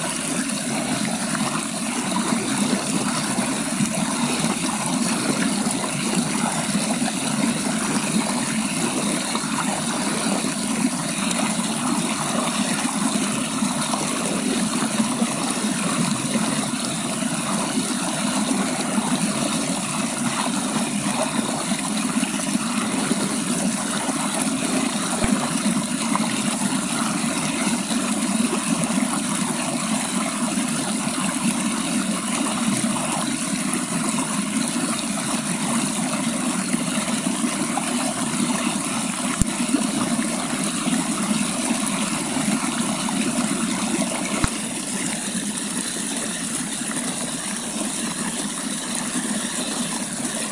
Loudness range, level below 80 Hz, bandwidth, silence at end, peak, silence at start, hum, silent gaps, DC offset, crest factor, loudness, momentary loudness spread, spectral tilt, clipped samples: 1 LU; -50 dBFS; 11.5 kHz; 0 s; 0 dBFS; 0 s; none; none; under 0.1%; 22 dB; -22 LUFS; 2 LU; -3 dB/octave; under 0.1%